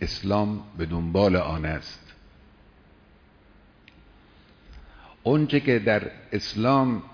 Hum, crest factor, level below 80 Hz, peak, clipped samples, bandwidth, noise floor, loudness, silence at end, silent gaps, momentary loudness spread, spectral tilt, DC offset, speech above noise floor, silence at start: none; 18 dB; -46 dBFS; -8 dBFS; under 0.1%; 5.4 kHz; -55 dBFS; -24 LUFS; 0.05 s; none; 10 LU; -7 dB/octave; under 0.1%; 31 dB; 0 s